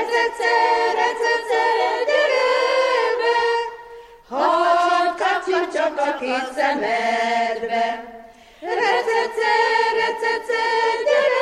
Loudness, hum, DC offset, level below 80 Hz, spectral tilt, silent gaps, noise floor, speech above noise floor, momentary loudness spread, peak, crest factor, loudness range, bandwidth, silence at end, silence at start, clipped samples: -19 LUFS; none; under 0.1%; -60 dBFS; -2 dB/octave; none; -43 dBFS; 22 dB; 6 LU; -6 dBFS; 14 dB; 3 LU; 12.5 kHz; 0 s; 0 s; under 0.1%